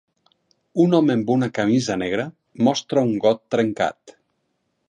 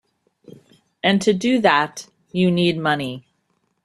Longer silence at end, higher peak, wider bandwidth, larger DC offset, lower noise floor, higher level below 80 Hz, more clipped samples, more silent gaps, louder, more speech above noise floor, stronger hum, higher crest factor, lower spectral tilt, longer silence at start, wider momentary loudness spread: first, 0.8 s vs 0.65 s; about the same, -4 dBFS vs -2 dBFS; second, 10 kHz vs 12.5 kHz; neither; about the same, -72 dBFS vs -69 dBFS; about the same, -60 dBFS vs -60 dBFS; neither; neither; about the same, -21 LUFS vs -19 LUFS; about the same, 52 dB vs 50 dB; neither; about the same, 18 dB vs 20 dB; about the same, -6 dB/octave vs -5.5 dB/octave; second, 0.75 s vs 1.05 s; second, 8 LU vs 13 LU